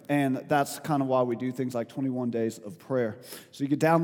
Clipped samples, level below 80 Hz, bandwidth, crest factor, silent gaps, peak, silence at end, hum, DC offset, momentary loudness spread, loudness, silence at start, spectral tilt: under 0.1%; -78 dBFS; 19 kHz; 18 dB; none; -8 dBFS; 0 s; none; under 0.1%; 8 LU; -29 LUFS; 0.1 s; -6.5 dB/octave